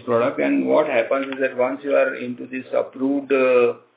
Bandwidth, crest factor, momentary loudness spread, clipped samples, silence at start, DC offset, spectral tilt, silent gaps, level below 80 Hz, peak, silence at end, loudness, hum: 4 kHz; 16 dB; 8 LU; under 0.1%; 0.05 s; under 0.1%; -9.5 dB/octave; none; -78 dBFS; -4 dBFS; 0.2 s; -20 LUFS; none